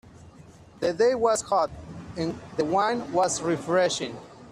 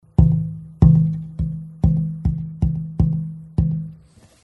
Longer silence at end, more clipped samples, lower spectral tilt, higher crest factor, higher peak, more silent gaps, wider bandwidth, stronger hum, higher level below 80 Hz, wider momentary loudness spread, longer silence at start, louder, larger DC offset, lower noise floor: second, 0 s vs 0.5 s; neither; second, -4 dB/octave vs -11.5 dB/octave; about the same, 16 dB vs 20 dB; second, -10 dBFS vs 0 dBFS; neither; first, 13 kHz vs 1.9 kHz; neither; second, -58 dBFS vs -28 dBFS; about the same, 11 LU vs 12 LU; second, 0.05 s vs 0.2 s; second, -25 LUFS vs -20 LUFS; neither; about the same, -49 dBFS vs -49 dBFS